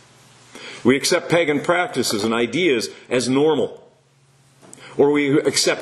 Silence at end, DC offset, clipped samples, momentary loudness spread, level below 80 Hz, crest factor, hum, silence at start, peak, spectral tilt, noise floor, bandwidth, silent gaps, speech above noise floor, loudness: 0 s; under 0.1%; under 0.1%; 6 LU; -62 dBFS; 18 dB; none; 0.55 s; -2 dBFS; -3.5 dB/octave; -56 dBFS; 13 kHz; none; 38 dB; -19 LUFS